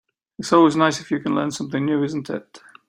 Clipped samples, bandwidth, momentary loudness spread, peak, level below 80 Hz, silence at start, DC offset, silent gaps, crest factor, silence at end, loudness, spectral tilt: under 0.1%; 11 kHz; 15 LU; -2 dBFS; -64 dBFS; 0.4 s; under 0.1%; none; 18 dB; 0.3 s; -20 LUFS; -5.5 dB/octave